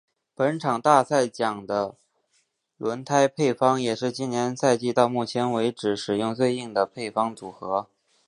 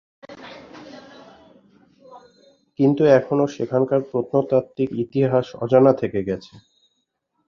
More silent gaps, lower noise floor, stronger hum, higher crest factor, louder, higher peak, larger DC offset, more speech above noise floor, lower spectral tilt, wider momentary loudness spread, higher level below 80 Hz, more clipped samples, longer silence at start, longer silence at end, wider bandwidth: neither; about the same, -70 dBFS vs -73 dBFS; neither; about the same, 22 dB vs 20 dB; second, -24 LUFS vs -20 LUFS; about the same, -2 dBFS vs -2 dBFS; neither; second, 46 dB vs 54 dB; second, -5 dB/octave vs -8.5 dB/octave; second, 9 LU vs 25 LU; second, -68 dBFS vs -60 dBFS; neither; about the same, 0.4 s vs 0.3 s; second, 0.45 s vs 1.05 s; first, 11 kHz vs 7 kHz